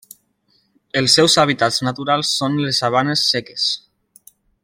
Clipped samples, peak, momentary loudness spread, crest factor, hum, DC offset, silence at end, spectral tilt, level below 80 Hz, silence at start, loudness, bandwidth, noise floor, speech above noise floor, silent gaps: under 0.1%; 0 dBFS; 8 LU; 18 dB; none; under 0.1%; 0.85 s; -3.5 dB/octave; -58 dBFS; 0.95 s; -16 LUFS; 16.5 kHz; -62 dBFS; 45 dB; none